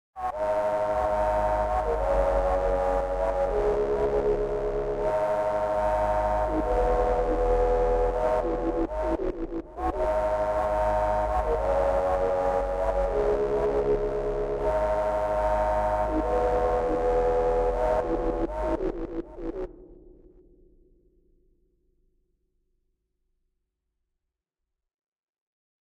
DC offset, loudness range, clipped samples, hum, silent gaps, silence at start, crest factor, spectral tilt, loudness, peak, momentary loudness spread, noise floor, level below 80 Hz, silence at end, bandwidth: under 0.1%; 5 LU; under 0.1%; none; none; 0.15 s; 14 dB; -7.5 dB/octave; -26 LUFS; -12 dBFS; 5 LU; -85 dBFS; -36 dBFS; 5.85 s; 11.5 kHz